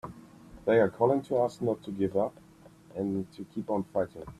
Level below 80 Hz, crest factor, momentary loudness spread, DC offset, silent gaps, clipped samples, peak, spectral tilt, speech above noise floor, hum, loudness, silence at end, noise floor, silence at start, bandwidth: -62 dBFS; 20 dB; 12 LU; under 0.1%; none; under 0.1%; -10 dBFS; -8 dB/octave; 26 dB; none; -30 LUFS; 0.05 s; -55 dBFS; 0.05 s; 13 kHz